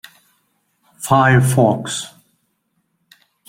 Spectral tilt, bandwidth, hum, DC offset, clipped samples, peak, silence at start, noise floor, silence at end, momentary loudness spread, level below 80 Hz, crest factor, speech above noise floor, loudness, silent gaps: -5.5 dB/octave; 16.5 kHz; none; under 0.1%; under 0.1%; -2 dBFS; 1 s; -68 dBFS; 1.4 s; 17 LU; -54 dBFS; 18 dB; 54 dB; -15 LUFS; none